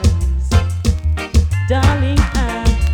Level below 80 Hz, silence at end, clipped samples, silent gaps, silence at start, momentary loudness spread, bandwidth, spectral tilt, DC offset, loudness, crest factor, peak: -18 dBFS; 0 s; under 0.1%; none; 0 s; 4 LU; 14.5 kHz; -6 dB/octave; under 0.1%; -16 LUFS; 12 dB; -2 dBFS